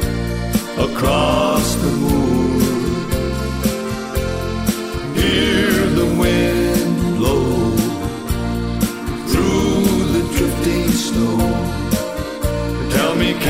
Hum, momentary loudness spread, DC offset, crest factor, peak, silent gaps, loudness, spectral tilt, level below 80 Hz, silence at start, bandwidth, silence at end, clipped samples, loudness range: none; 7 LU; under 0.1%; 14 dB; -4 dBFS; none; -18 LUFS; -5.5 dB/octave; -28 dBFS; 0 s; 16 kHz; 0 s; under 0.1%; 2 LU